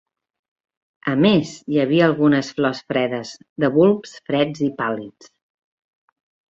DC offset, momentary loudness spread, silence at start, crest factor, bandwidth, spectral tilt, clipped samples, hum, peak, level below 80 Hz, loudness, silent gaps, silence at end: under 0.1%; 12 LU; 1.05 s; 18 dB; 7.8 kHz; -6.5 dB/octave; under 0.1%; none; -4 dBFS; -60 dBFS; -19 LUFS; 3.49-3.56 s; 1.4 s